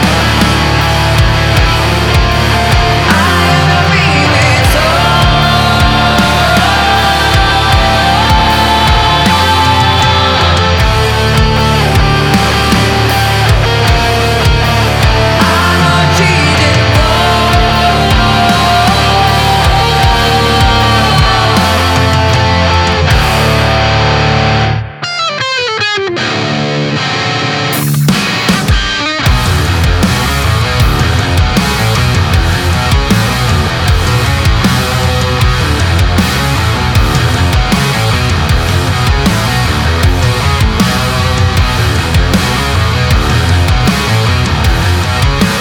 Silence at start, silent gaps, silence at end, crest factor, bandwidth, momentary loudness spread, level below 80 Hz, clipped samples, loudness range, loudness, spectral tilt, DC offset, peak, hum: 0 s; none; 0 s; 8 dB; 19.5 kHz; 3 LU; -18 dBFS; under 0.1%; 3 LU; -9 LUFS; -4.5 dB/octave; under 0.1%; 0 dBFS; none